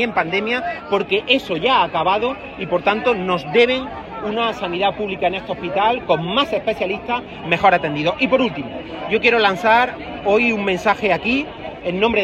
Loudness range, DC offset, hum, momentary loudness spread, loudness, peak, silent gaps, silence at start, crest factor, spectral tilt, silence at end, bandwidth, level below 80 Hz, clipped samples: 3 LU; under 0.1%; none; 9 LU; -18 LUFS; 0 dBFS; none; 0 s; 18 dB; -5.5 dB/octave; 0 s; 13 kHz; -48 dBFS; under 0.1%